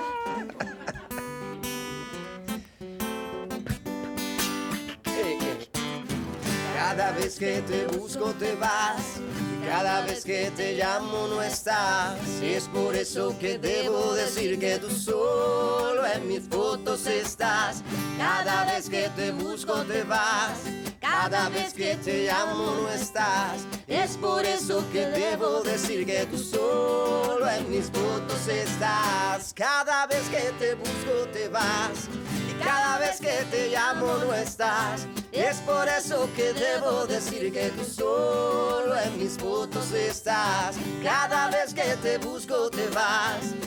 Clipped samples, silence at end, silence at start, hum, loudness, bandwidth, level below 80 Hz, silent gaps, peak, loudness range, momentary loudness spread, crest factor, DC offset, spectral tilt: under 0.1%; 0 s; 0 s; none; -27 LUFS; 19.5 kHz; -56 dBFS; none; -12 dBFS; 3 LU; 8 LU; 16 dB; under 0.1%; -3.5 dB/octave